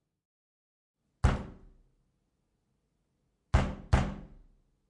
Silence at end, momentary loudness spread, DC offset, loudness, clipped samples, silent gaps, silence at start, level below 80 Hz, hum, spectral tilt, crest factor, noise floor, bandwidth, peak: 0.65 s; 13 LU; under 0.1%; -32 LUFS; under 0.1%; none; 1.25 s; -40 dBFS; none; -6.5 dB/octave; 26 dB; -78 dBFS; 11 kHz; -10 dBFS